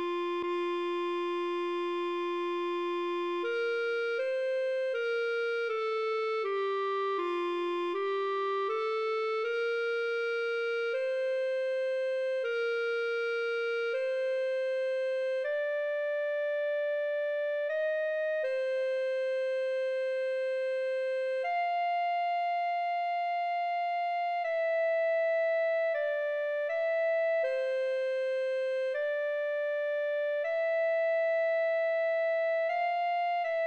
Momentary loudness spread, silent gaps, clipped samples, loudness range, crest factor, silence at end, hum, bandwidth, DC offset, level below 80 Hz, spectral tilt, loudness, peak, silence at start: 3 LU; none; under 0.1%; 2 LU; 10 dB; 0 s; none; 8.4 kHz; under 0.1%; -88 dBFS; -2.5 dB/octave; -31 LUFS; -20 dBFS; 0 s